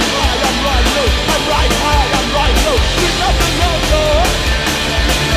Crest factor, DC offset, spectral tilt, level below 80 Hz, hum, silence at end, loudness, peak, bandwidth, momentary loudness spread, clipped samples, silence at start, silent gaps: 12 dB; under 0.1%; -3.5 dB/octave; -18 dBFS; none; 0 s; -13 LUFS; 0 dBFS; 15.5 kHz; 1 LU; under 0.1%; 0 s; none